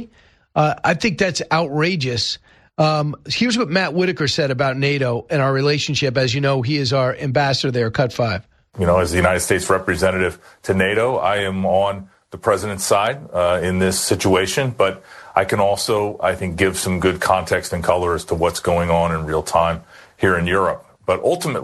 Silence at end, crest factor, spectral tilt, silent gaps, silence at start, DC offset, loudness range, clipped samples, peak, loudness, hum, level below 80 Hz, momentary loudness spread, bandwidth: 0 s; 18 dB; -4.5 dB/octave; none; 0 s; under 0.1%; 1 LU; under 0.1%; 0 dBFS; -19 LUFS; none; -44 dBFS; 5 LU; 13 kHz